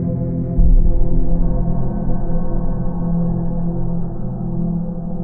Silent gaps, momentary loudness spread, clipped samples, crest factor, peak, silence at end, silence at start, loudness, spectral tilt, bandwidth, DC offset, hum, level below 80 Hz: none; 6 LU; under 0.1%; 12 dB; -4 dBFS; 0 s; 0 s; -21 LUFS; -14.5 dB/octave; 1.6 kHz; under 0.1%; none; -18 dBFS